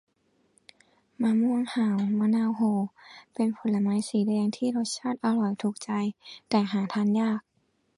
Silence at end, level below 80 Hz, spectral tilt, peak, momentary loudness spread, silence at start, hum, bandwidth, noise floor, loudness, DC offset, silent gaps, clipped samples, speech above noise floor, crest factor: 0.55 s; -74 dBFS; -6 dB/octave; -12 dBFS; 6 LU; 1.2 s; none; 11.5 kHz; -71 dBFS; -27 LUFS; under 0.1%; none; under 0.1%; 45 dB; 16 dB